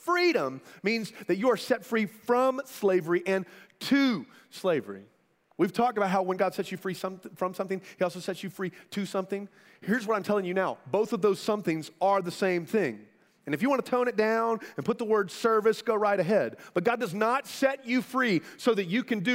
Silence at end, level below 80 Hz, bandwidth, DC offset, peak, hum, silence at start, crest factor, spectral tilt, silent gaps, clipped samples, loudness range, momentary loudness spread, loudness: 0 s; -76 dBFS; 16 kHz; under 0.1%; -10 dBFS; none; 0.05 s; 18 dB; -5.5 dB/octave; none; under 0.1%; 5 LU; 10 LU; -28 LUFS